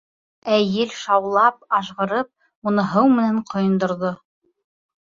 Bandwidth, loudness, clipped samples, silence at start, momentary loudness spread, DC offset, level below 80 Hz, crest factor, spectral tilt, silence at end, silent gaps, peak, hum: 7.6 kHz; -20 LUFS; under 0.1%; 0.45 s; 11 LU; under 0.1%; -64 dBFS; 18 dB; -6.5 dB/octave; 0.9 s; 2.55-2.62 s; -2 dBFS; none